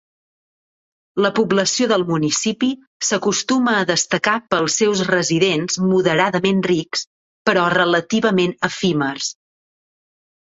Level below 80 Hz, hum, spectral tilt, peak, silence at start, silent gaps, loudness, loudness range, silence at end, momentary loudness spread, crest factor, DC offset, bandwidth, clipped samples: -60 dBFS; none; -3.5 dB/octave; -2 dBFS; 1.15 s; 2.87-3.00 s, 7.07-7.45 s; -18 LUFS; 2 LU; 1.1 s; 6 LU; 18 dB; under 0.1%; 8.2 kHz; under 0.1%